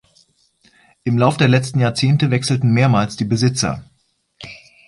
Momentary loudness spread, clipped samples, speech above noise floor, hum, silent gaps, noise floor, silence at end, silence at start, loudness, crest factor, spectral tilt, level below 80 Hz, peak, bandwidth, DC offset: 19 LU; under 0.1%; 42 dB; none; none; -57 dBFS; 0.3 s; 1.05 s; -17 LUFS; 16 dB; -6 dB/octave; -50 dBFS; -2 dBFS; 11.5 kHz; under 0.1%